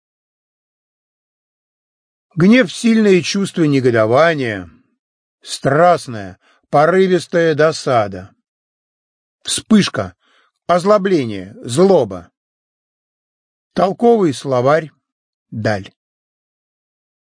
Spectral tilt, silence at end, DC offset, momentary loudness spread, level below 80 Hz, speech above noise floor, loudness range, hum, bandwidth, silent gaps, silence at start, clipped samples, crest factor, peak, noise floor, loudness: -5.5 dB/octave; 1.55 s; under 0.1%; 17 LU; -58 dBFS; 44 dB; 4 LU; none; 10.5 kHz; 4.99-5.38 s, 8.48-9.39 s, 12.37-13.71 s, 15.12-15.46 s; 2.35 s; under 0.1%; 16 dB; 0 dBFS; -58 dBFS; -14 LUFS